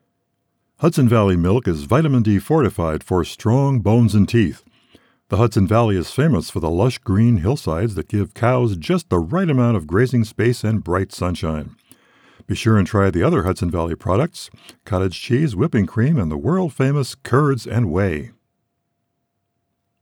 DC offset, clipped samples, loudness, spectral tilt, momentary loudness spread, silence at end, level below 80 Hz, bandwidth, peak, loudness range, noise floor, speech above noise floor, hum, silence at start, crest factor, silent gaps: under 0.1%; under 0.1%; -18 LUFS; -7.5 dB/octave; 7 LU; 1.75 s; -40 dBFS; 16.5 kHz; -4 dBFS; 3 LU; -73 dBFS; 56 dB; none; 0.8 s; 14 dB; none